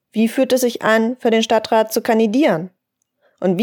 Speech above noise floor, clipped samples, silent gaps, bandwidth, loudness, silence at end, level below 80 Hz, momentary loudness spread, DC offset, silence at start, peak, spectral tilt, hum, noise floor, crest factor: 51 dB; under 0.1%; none; 19 kHz; -17 LUFS; 0 s; -70 dBFS; 6 LU; under 0.1%; 0.15 s; -2 dBFS; -4.5 dB/octave; none; -67 dBFS; 16 dB